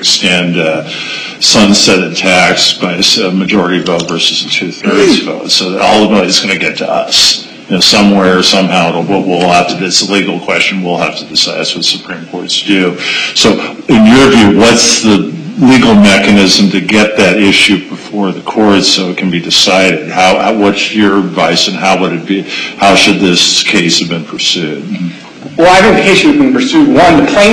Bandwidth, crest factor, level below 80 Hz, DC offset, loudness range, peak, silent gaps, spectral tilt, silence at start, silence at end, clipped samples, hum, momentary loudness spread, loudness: 16 kHz; 8 dB; -40 dBFS; under 0.1%; 4 LU; 0 dBFS; none; -3.5 dB/octave; 0 s; 0 s; 0.3%; none; 9 LU; -7 LUFS